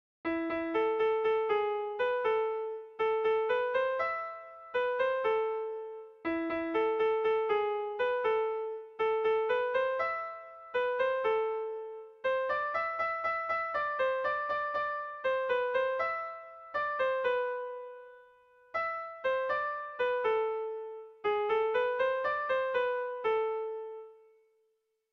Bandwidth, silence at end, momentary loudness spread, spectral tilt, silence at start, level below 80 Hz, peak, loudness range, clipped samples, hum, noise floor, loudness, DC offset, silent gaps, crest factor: 6 kHz; 1 s; 10 LU; -5 dB/octave; 0.25 s; -70 dBFS; -20 dBFS; 3 LU; under 0.1%; none; -77 dBFS; -32 LUFS; under 0.1%; none; 12 dB